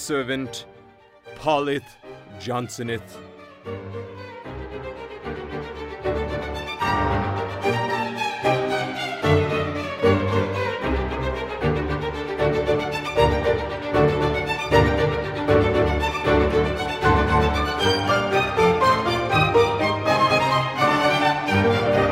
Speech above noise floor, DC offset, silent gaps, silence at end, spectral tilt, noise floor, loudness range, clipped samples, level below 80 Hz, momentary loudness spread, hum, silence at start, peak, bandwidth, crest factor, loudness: 23 dB; under 0.1%; none; 0 s; -5.5 dB/octave; -50 dBFS; 12 LU; under 0.1%; -36 dBFS; 15 LU; none; 0 s; -4 dBFS; 16 kHz; 18 dB; -22 LUFS